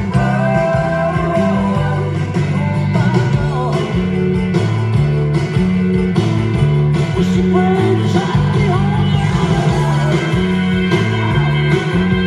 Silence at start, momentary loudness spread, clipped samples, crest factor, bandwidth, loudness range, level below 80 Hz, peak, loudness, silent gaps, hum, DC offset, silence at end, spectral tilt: 0 s; 3 LU; under 0.1%; 12 dB; 10.5 kHz; 2 LU; -32 dBFS; -2 dBFS; -15 LUFS; none; none; under 0.1%; 0 s; -7.5 dB/octave